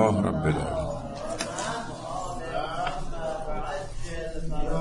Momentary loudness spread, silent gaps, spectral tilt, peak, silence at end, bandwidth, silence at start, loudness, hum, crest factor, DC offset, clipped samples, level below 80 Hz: 9 LU; none; -5.5 dB/octave; -10 dBFS; 0 s; 11 kHz; 0 s; -31 LUFS; none; 20 dB; under 0.1%; under 0.1%; -36 dBFS